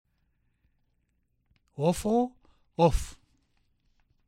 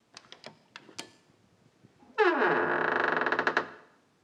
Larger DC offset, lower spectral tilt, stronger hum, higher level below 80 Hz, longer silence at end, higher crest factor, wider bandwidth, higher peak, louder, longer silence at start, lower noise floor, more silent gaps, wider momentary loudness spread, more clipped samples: neither; first, -6.5 dB/octave vs -4.5 dB/octave; neither; first, -44 dBFS vs -84 dBFS; first, 1.1 s vs 0.45 s; about the same, 22 dB vs 22 dB; first, 16 kHz vs 10.5 kHz; about the same, -10 dBFS vs -8 dBFS; about the same, -28 LUFS vs -27 LUFS; first, 1.8 s vs 0.45 s; first, -74 dBFS vs -64 dBFS; neither; second, 18 LU vs 23 LU; neither